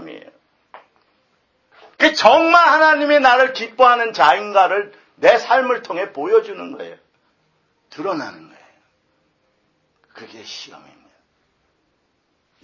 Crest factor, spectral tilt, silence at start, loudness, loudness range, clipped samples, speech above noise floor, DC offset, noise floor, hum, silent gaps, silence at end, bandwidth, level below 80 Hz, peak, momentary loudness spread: 18 dB; -3 dB/octave; 0 s; -14 LUFS; 20 LU; under 0.1%; 51 dB; under 0.1%; -67 dBFS; none; none; 2 s; 8 kHz; -64 dBFS; 0 dBFS; 22 LU